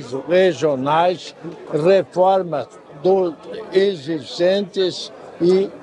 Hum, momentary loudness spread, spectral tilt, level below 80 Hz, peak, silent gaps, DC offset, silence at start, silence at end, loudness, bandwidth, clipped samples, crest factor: none; 13 LU; -6 dB/octave; -66 dBFS; -4 dBFS; none; under 0.1%; 0 s; 0 s; -18 LUFS; 10 kHz; under 0.1%; 16 dB